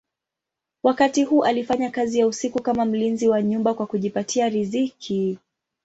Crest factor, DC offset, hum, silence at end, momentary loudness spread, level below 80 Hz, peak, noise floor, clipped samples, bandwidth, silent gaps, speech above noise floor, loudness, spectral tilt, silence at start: 18 dB; under 0.1%; none; 0.5 s; 6 LU; -62 dBFS; -4 dBFS; -86 dBFS; under 0.1%; 8.2 kHz; none; 65 dB; -22 LUFS; -5 dB/octave; 0.85 s